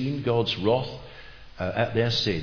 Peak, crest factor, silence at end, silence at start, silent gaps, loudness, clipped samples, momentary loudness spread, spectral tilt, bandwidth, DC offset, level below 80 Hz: -8 dBFS; 18 dB; 0 s; 0 s; none; -25 LUFS; under 0.1%; 18 LU; -6 dB/octave; 5.4 kHz; under 0.1%; -50 dBFS